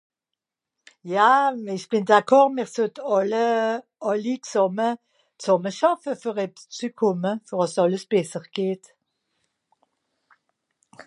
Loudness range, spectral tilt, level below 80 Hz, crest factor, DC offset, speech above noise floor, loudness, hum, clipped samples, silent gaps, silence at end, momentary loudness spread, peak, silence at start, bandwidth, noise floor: 7 LU; -5 dB/octave; -80 dBFS; 22 dB; under 0.1%; 64 dB; -23 LUFS; none; under 0.1%; none; 0.05 s; 13 LU; -2 dBFS; 1.05 s; 11.5 kHz; -86 dBFS